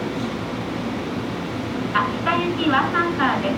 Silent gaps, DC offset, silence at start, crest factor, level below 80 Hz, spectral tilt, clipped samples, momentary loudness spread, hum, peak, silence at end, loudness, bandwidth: none; under 0.1%; 0 s; 18 dB; -48 dBFS; -6 dB/octave; under 0.1%; 8 LU; none; -6 dBFS; 0 s; -23 LUFS; 16.5 kHz